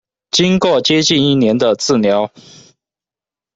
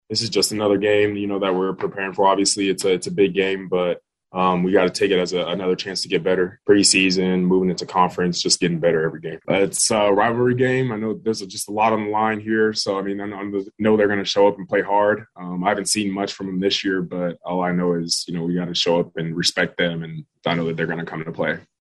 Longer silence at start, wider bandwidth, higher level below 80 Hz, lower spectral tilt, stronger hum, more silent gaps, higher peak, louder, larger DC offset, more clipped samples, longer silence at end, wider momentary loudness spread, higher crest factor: first, 0.35 s vs 0.1 s; second, 8 kHz vs 12.5 kHz; first, -52 dBFS vs -58 dBFS; about the same, -4.5 dB/octave vs -4 dB/octave; neither; neither; about the same, -2 dBFS vs -2 dBFS; first, -13 LUFS vs -20 LUFS; neither; neither; first, 1.3 s vs 0.2 s; second, 5 LU vs 8 LU; about the same, 14 dB vs 18 dB